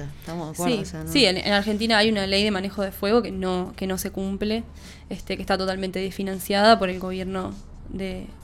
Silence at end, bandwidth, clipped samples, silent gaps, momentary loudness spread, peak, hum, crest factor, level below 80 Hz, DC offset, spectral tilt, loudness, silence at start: 0 s; 17 kHz; under 0.1%; none; 15 LU; -2 dBFS; none; 22 dB; -44 dBFS; under 0.1%; -4.5 dB/octave; -23 LUFS; 0 s